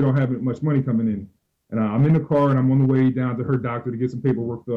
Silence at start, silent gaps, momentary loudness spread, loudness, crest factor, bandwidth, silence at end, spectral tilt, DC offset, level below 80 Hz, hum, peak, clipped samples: 0 s; none; 8 LU; -21 LUFS; 10 dB; 4.1 kHz; 0 s; -10.5 dB/octave; under 0.1%; -54 dBFS; none; -10 dBFS; under 0.1%